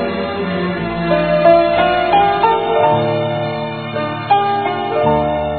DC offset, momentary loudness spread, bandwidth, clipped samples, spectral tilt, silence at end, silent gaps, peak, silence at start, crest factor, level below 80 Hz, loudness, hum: 0.3%; 10 LU; 4.6 kHz; under 0.1%; -9.5 dB/octave; 0 s; none; 0 dBFS; 0 s; 14 dB; -40 dBFS; -15 LUFS; none